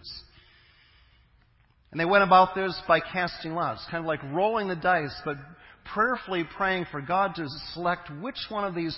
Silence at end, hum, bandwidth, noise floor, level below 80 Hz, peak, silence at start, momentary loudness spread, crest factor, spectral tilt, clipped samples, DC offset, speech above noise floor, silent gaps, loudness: 0 s; none; 5.8 kHz; -62 dBFS; -58 dBFS; -6 dBFS; 0.05 s; 14 LU; 22 dB; -9 dB/octave; under 0.1%; under 0.1%; 36 dB; none; -26 LUFS